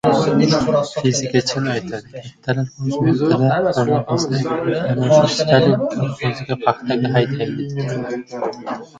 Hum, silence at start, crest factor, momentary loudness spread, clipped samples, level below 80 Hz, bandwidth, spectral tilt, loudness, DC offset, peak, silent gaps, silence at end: none; 0.05 s; 18 dB; 11 LU; under 0.1%; -52 dBFS; 9.2 kHz; -6 dB/octave; -18 LUFS; under 0.1%; 0 dBFS; none; 0 s